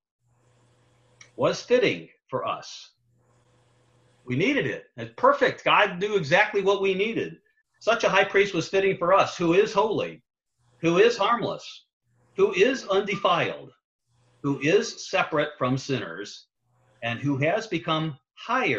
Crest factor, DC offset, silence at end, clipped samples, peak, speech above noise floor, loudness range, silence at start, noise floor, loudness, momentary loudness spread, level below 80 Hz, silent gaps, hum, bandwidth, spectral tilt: 20 dB; under 0.1%; 0 s; under 0.1%; -6 dBFS; 42 dB; 6 LU; 1.4 s; -65 dBFS; -24 LUFS; 14 LU; -64 dBFS; 11.93-12.00 s, 13.84-13.99 s; none; 7.8 kHz; -5 dB/octave